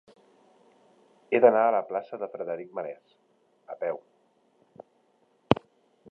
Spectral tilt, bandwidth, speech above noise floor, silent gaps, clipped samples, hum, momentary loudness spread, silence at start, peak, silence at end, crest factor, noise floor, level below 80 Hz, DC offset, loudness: -8 dB/octave; 6 kHz; 41 dB; none; under 0.1%; none; 20 LU; 1.3 s; -2 dBFS; 0.55 s; 28 dB; -67 dBFS; -62 dBFS; under 0.1%; -27 LUFS